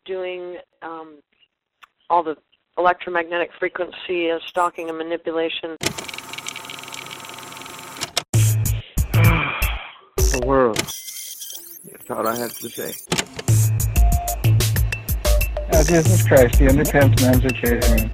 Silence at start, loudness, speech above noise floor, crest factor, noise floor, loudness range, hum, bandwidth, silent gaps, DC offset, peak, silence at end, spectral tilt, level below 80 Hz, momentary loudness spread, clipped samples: 0.05 s; -20 LUFS; 45 dB; 18 dB; -64 dBFS; 9 LU; none; 16.5 kHz; 8.29-8.33 s; under 0.1%; -2 dBFS; 0 s; -5 dB/octave; -26 dBFS; 17 LU; under 0.1%